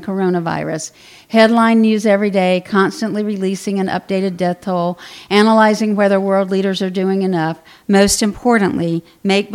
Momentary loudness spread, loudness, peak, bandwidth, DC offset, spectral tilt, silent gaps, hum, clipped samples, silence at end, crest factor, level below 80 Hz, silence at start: 9 LU; -15 LUFS; 0 dBFS; 15 kHz; under 0.1%; -5 dB/octave; none; none; under 0.1%; 0 s; 14 dB; -48 dBFS; 0 s